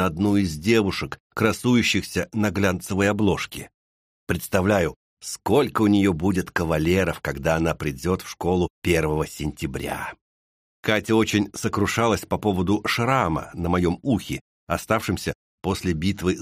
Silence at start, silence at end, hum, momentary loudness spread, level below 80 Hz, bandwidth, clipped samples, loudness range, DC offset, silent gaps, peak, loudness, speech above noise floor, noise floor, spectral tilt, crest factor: 0 s; 0 s; none; 10 LU; -44 dBFS; 15.5 kHz; under 0.1%; 3 LU; under 0.1%; 1.20-1.30 s, 3.74-4.27 s, 4.96-5.17 s, 8.70-8.82 s, 10.21-10.83 s, 14.41-14.67 s, 15.35-15.58 s; -4 dBFS; -23 LUFS; over 67 dB; under -90 dBFS; -5.5 dB/octave; 20 dB